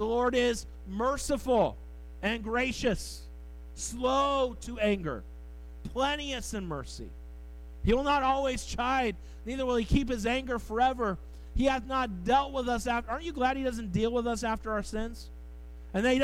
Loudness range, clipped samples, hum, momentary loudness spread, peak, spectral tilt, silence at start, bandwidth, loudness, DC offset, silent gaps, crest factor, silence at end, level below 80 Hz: 3 LU; under 0.1%; none; 19 LU; -14 dBFS; -4.5 dB/octave; 0 s; 16 kHz; -30 LUFS; under 0.1%; none; 18 dB; 0 s; -42 dBFS